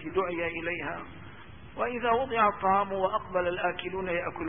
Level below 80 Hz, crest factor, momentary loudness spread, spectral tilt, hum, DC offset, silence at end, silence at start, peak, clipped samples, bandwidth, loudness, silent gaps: -56 dBFS; 20 dB; 20 LU; -9.5 dB/octave; none; 0.3%; 0 s; 0 s; -10 dBFS; under 0.1%; 3.7 kHz; -29 LUFS; none